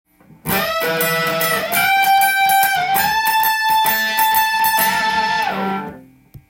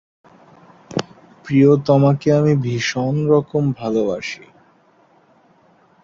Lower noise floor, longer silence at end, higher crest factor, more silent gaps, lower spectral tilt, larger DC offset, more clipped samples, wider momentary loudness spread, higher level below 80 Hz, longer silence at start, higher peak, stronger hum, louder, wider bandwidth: second, -43 dBFS vs -54 dBFS; second, 0.5 s vs 1.65 s; about the same, 14 dB vs 18 dB; neither; second, -2 dB/octave vs -7 dB/octave; neither; neither; second, 7 LU vs 13 LU; about the same, -52 dBFS vs -56 dBFS; second, 0.45 s vs 0.9 s; about the same, -2 dBFS vs -2 dBFS; neither; about the same, -15 LUFS vs -17 LUFS; first, 17 kHz vs 7.4 kHz